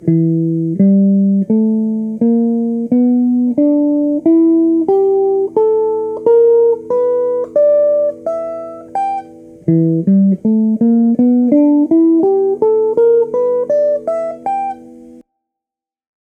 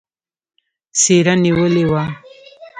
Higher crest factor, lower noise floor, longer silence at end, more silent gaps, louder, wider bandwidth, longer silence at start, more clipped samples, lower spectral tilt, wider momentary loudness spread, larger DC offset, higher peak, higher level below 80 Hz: about the same, 12 dB vs 16 dB; first, -87 dBFS vs -40 dBFS; first, 1.05 s vs 0 s; neither; about the same, -13 LUFS vs -14 LUFS; second, 2.5 kHz vs 9.6 kHz; second, 0 s vs 0.95 s; neither; first, -12 dB/octave vs -4.5 dB/octave; second, 9 LU vs 12 LU; neither; about the same, 0 dBFS vs 0 dBFS; second, -60 dBFS vs -48 dBFS